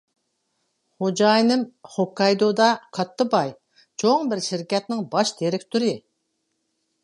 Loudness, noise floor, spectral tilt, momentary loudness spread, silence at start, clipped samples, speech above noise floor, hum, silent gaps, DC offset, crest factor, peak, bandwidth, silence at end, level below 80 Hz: -22 LUFS; -74 dBFS; -4.5 dB/octave; 10 LU; 1 s; under 0.1%; 53 dB; none; none; under 0.1%; 20 dB; -2 dBFS; 11.5 kHz; 1.05 s; -74 dBFS